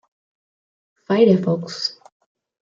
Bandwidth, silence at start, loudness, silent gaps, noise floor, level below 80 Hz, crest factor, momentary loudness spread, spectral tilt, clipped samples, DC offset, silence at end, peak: 7.6 kHz; 1.1 s; -19 LUFS; none; under -90 dBFS; -66 dBFS; 18 dB; 11 LU; -6.5 dB/octave; under 0.1%; under 0.1%; 0.7 s; -4 dBFS